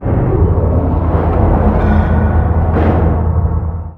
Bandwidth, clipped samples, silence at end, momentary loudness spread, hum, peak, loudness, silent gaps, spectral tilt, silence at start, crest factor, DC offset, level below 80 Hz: 3.8 kHz; under 0.1%; 0 s; 3 LU; none; 0 dBFS; -13 LUFS; none; -11.5 dB/octave; 0 s; 12 dB; under 0.1%; -16 dBFS